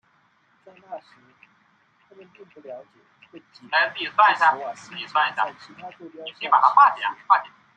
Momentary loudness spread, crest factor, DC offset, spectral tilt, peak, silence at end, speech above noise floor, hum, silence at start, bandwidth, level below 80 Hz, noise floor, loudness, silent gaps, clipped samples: 24 LU; 22 dB; under 0.1%; -2.5 dB/octave; -2 dBFS; 0.3 s; 40 dB; none; 0.9 s; 9 kHz; -82 dBFS; -63 dBFS; -20 LUFS; none; under 0.1%